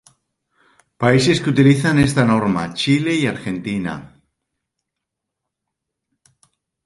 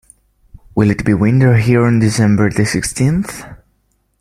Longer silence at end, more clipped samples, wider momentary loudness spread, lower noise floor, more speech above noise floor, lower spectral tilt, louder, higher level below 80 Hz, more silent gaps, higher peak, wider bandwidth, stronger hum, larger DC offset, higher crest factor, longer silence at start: first, 2.8 s vs 0.65 s; neither; about the same, 11 LU vs 9 LU; first, -81 dBFS vs -61 dBFS; first, 65 dB vs 49 dB; about the same, -6 dB/octave vs -6.5 dB/octave; second, -17 LUFS vs -13 LUFS; second, -48 dBFS vs -38 dBFS; neither; about the same, 0 dBFS vs 0 dBFS; second, 11.5 kHz vs 13.5 kHz; neither; neither; first, 20 dB vs 14 dB; first, 1 s vs 0.75 s